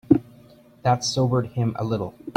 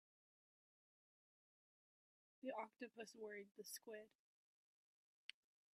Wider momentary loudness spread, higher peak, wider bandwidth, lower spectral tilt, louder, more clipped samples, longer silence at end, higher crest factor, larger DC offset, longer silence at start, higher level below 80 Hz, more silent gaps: second, 6 LU vs 10 LU; first, -2 dBFS vs -34 dBFS; about the same, 11 kHz vs 11.5 kHz; first, -6 dB/octave vs -2.5 dB/octave; first, -24 LUFS vs -56 LUFS; neither; second, 0.05 s vs 1.65 s; about the same, 22 dB vs 26 dB; neither; second, 0.1 s vs 2.45 s; first, -54 dBFS vs under -90 dBFS; neither